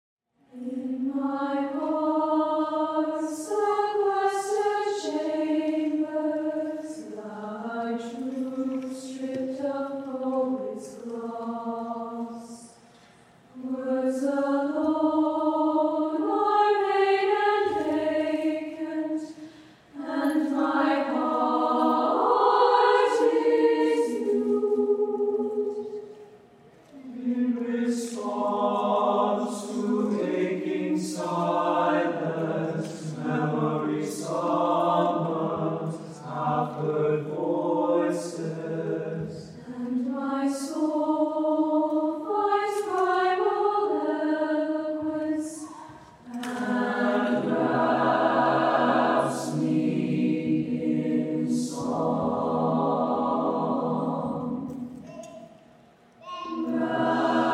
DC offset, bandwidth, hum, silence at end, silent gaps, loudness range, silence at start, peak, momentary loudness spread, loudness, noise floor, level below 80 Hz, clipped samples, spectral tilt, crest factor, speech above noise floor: under 0.1%; 13 kHz; none; 0 s; none; 8 LU; 0.55 s; -8 dBFS; 12 LU; -26 LUFS; -55 dBFS; -72 dBFS; under 0.1%; -6 dB/octave; 18 dB; 30 dB